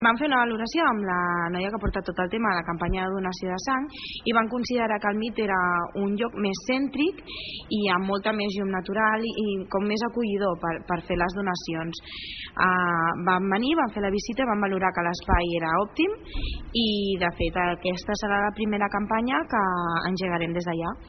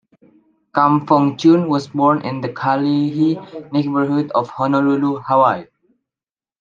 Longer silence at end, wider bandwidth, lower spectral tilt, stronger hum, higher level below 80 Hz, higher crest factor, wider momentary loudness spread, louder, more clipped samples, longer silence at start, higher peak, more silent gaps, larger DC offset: second, 0 s vs 1 s; second, 6.4 kHz vs 7.4 kHz; second, -3.5 dB/octave vs -8 dB/octave; neither; first, -42 dBFS vs -66 dBFS; about the same, 20 dB vs 16 dB; about the same, 6 LU vs 8 LU; second, -26 LUFS vs -17 LUFS; neither; second, 0 s vs 0.75 s; second, -6 dBFS vs 0 dBFS; neither; neither